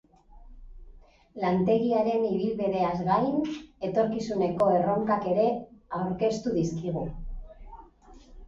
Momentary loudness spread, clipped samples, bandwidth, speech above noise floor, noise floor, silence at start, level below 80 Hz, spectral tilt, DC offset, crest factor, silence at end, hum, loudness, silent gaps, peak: 12 LU; under 0.1%; 7.8 kHz; 26 dB; -52 dBFS; 0.35 s; -48 dBFS; -7.5 dB/octave; under 0.1%; 16 dB; 0 s; none; -27 LUFS; none; -12 dBFS